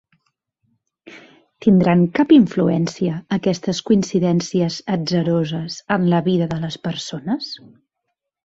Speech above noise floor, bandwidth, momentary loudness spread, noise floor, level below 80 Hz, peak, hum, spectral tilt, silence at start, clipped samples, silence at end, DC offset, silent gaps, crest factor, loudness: 60 dB; 8 kHz; 12 LU; -78 dBFS; -56 dBFS; -2 dBFS; none; -6.5 dB/octave; 1.05 s; under 0.1%; 0.9 s; under 0.1%; none; 18 dB; -18 LUFS